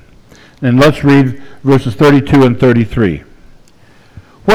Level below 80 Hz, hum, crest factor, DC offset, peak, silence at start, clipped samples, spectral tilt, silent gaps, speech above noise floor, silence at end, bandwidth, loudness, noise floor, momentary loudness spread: -36 dBFS; none; 12 dB; under 0.1%; 0 dBFS; 0.6 s; under 0.1%; -7.5 dB/octave; none; 35 dB; 0 s; 13.5 kHz; -10 LUFS; -44 dBFS; 11 LU